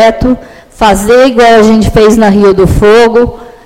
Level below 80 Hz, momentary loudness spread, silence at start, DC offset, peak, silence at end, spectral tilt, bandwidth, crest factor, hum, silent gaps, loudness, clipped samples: -20 dBFS; 8 LU; 0 s; under 0.1%; 0 dBFS; 0.2 s; -5.5 dB/octave; 16.5 kHz; 6 dB; none; none; -5 LUFS; 4%